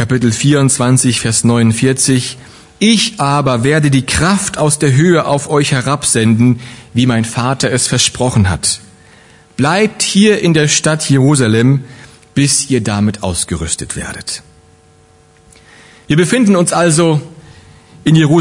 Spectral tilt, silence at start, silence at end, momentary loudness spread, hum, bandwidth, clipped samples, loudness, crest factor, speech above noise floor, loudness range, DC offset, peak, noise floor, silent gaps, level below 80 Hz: -4.5 dB/octave; 0 s; 0 s; 8 LU; none; 11 kHz; under 0.1%; -12 LUFS; 12 dB; 35 dB; 5 LU; 0.1%; 0 dBFS; -46 dBFS; none; -42 dBFS